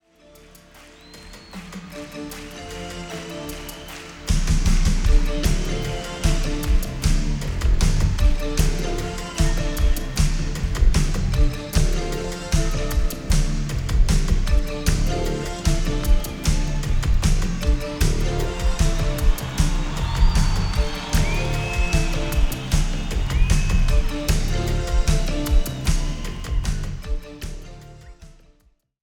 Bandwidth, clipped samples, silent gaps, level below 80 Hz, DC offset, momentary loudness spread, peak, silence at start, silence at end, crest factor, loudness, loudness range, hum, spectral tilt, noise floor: 17 kHz; under 0.1%; none; -22 dBFS; under 0.1%; 12 LU; -4 dBFS; 1.1 s; 0.75 s; 16 dB; -24 LUFS; 5 LU; none; -5 dB/octave; -60 dBFS